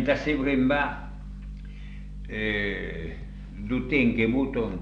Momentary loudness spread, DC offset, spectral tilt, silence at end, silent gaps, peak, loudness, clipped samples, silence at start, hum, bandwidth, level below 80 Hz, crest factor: 18 LU; under 0.1%; -7.5 dB/octave; 0 s; none; -10 dBFS; -26 LUFS; under 0.1%; 0 s; 50 Hz at -40 dBFS; 7.2 kHz; -38 dBFS; 16 dB